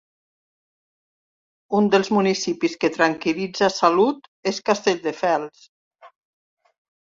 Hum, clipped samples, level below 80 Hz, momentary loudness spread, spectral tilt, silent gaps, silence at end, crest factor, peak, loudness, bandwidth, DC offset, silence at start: none; under 0.1%; -66 dBFS; 7 LU; -4.5 dB/octave; 4.28-4.43 s, 5.69-5.91 s; 1 s; 20 dB; -2 dBFS; -21 LUFS; 7.6 kHz; under 0.1%; 1.7 s